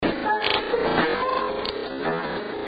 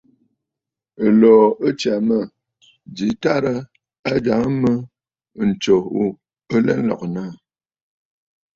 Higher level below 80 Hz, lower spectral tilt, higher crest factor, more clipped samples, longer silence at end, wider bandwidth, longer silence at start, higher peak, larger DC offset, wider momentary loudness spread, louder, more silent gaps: about the same, -50 dBFS vs -54 dBFS; about the same, -7 dB/octave vs -7 dB/octave; about the same, 20 dB vs 18 dB; neither; second, 0 s vs 1.2 s; about the same, 7.8 kHz vs 7.8 kHz; second, 0 s vs 1 s; second, -6 dBFS vs -2 dBFS; neither; second, 6 LU vs 15 LU; second, -24 LUFS vs -18 LUFS; second, none vs 3.99-4.03 s